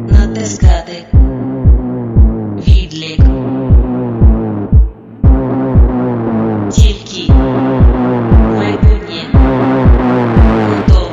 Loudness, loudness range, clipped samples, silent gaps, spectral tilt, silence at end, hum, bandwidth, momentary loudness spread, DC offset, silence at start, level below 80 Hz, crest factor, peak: -11 LUFS; 2 LU; 1%; none; -7.5 dB/octave; 0 s; none; 7.6 kHz; 5 LU; under 0.1%; 0 s; -12 dBFS; 10 dB; 0 dBFS